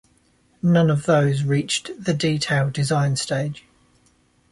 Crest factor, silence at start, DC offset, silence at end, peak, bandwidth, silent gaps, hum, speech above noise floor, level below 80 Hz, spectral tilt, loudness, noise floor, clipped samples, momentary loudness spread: 14 dB; 0.65 s; under 0.1%; 0.95 s; -6 dBFS; 11.5 kHz; none; none; 40 dB; -54 dBFS; -5.5 dB/octave; -21 LUFS; -60 dBFS; under 0.1%; 8 LU